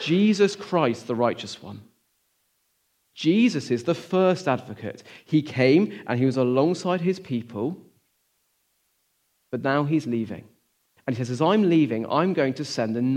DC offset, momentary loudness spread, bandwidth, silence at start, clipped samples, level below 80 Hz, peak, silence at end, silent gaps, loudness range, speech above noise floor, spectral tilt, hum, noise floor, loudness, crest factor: under 0.1%; 16 LU; 11.5 kHz; 0 s; under 0.1%; -72 dBFS; -6 dBFS; 0 s; none; 7 LU; 48 dB; -6.5 dB/octave; none; -71 dBFS; -23 LUFS; 18 dB